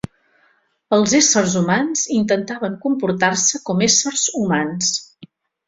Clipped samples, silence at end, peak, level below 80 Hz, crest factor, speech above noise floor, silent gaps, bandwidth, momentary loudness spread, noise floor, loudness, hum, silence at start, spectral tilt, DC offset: under 0.1%; 0.4 s; -2 dBFS; -56 dBFS; 18 dB; 43 dB; none; 8 kHz; 8 LU; -61 dBFS; -17 LUFS; none; 0.9 s; -3 dB/octave; under 0.1%